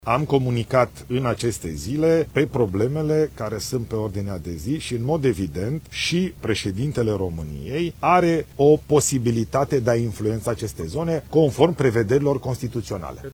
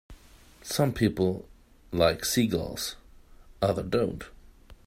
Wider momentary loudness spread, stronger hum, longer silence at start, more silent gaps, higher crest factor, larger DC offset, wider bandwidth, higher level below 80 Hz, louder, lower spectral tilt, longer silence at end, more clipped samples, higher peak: second, 10 LU vs 16 LU; neither; about the same, 0.05 s vs 0.1 s; neither; about the same, 20 dB vs 20 dB; neither; first, 19 kHz vs 16 kHz; first, -44 dBFS vs -50 dBFS; first, -22 LUFS vs -28 LUFS; about the same, -6 dB/octave vs -5 dB/octave; second, 0 s vs 0.15 s; neither; first, -2 dBFS vs -8 dBFS